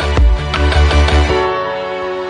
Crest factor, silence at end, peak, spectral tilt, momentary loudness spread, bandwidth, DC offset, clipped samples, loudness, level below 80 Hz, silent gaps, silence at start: 12 dB; 0 s; -2 dBFS; -6 dB/octave; 8 LU; 10 kHz; under 0.1%; under 0.1%; -14 LUFS; -16 dBFS; none; 0 s